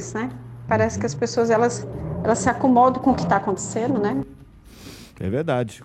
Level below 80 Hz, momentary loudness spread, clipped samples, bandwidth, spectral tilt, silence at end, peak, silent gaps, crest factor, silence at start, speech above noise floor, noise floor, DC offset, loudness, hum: -46 dBFS; 15 LU; under 0.1%; 12.5 kHz; -6 dB/octave; 0 s; -4 dBFS; none; 18 dB; 0 s; 24 dB; -45 dBFS; under 0.1%; -21 LUFS; none